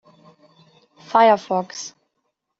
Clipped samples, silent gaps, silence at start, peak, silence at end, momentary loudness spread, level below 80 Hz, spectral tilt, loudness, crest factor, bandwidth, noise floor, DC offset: under 0.1%; none; 1.1 s; -2 dBFS; 0.7 s; 18 LU; -74 dBFS; -3 dB/octave; -18 LUFS; 20 dB; 8 kHz; -75 dBFS; under 0.1%